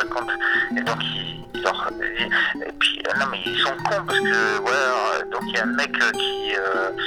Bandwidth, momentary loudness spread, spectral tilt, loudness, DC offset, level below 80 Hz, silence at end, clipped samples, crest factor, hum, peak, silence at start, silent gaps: 17 kHz; 5 LU; -3 dB/octave; -22 LUFS; under 0.1%; -52 dBFS; 0 s; under 0.1%; 20 dB; none; -4 dBFS; 0 s; none